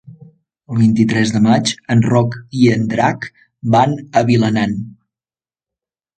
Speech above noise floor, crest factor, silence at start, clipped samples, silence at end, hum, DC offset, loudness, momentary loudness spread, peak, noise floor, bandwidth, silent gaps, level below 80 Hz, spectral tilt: over 76 dB; 16 dB; 0.1 s; under 0.1%; 1.25 s; none; under 0.1%; -15 LUFS; 12 LU; 0 dBFS; under -90 dBFS; 9.2 kHz; none; -50 dBFS; -6.5 dB/octave